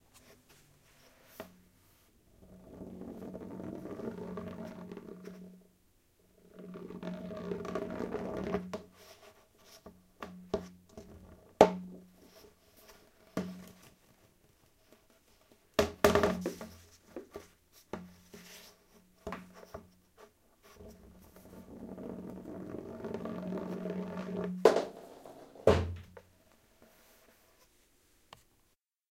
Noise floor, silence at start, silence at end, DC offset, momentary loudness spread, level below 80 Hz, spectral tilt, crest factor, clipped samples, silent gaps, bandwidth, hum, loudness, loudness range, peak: -75 dBFS; 0.15 s; 2.25 s; under 0.1%; 28 LU; -58 dBFS; -5.5 dB/octave; 36 dB; under 0.1%; none; 16 kHz; none; -36 LUFS; 17 LU; -2 dBFS